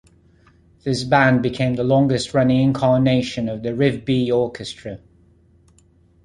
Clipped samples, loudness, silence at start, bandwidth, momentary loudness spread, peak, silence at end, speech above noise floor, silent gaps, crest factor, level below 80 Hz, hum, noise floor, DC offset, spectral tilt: under 0.1%; -19 LUFS; 0.85 s; 11.5 kHz; 15 LU; -2 dBFS; 1.3 s; 36 dB; none; 18 dB; -48 dBFS; none; -55 dBFS; under 0.1%; -6.5 dB/octave